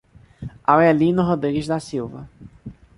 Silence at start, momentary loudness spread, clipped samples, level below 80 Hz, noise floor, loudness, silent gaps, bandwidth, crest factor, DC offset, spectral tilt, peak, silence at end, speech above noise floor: 0.4 s; 24 LU; under 0.1%; -48 dBFS; -41 dBFS; -19 LUFS; none; 11.5 kHz; 20 dB; under 0.1%; -7.5 dB/octave; -2 dBFS; 0.25 s; 22 dB